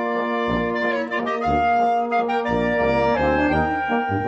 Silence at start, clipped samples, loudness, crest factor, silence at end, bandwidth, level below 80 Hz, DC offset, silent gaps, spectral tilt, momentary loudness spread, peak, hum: 0 s; under 0.1%; -21 LUFS; 14 dB; 0 s; 8.2 kHz; -40 dBFS; under 0.1%; none; -7 dB/octave; 4 LU; -8 dBFS; none